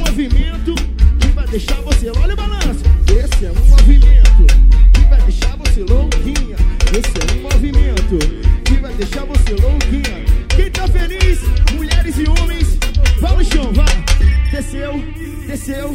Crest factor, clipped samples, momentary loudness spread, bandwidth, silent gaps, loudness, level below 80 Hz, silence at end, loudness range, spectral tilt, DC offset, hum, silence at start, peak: 10 dB; under 0.1%; 9 LU; 12 kHz; none; -15 LUFS; -10 dBFS; 0 s; 5 LU; -5.5 dB/octave; under 0.1%; none; 0 s; 0 dBFS